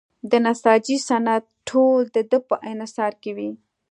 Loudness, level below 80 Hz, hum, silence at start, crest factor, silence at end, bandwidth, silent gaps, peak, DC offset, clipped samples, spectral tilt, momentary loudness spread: -21 LUFS; -72 dBFS; none; 0.25 s; 20 dB; 0.35 s; 10.5 kHz; none; -2 dBFS; under 0.1%; under 0.1%; -4 dB/octave; 12 LU